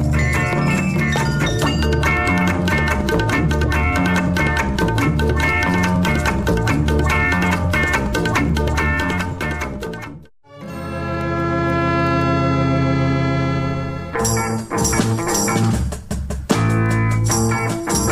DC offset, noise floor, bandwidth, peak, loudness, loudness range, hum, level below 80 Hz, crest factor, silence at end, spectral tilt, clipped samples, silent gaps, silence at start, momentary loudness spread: under 0.1%; -40 dBFS; 15.5 kHz; -2 dBFS; -18 LUFS; 4 LU; none; -28 dBFS; 14 dB; 0 s; -5 dB/octave; under 0.1%; none; 0 s; 7 LU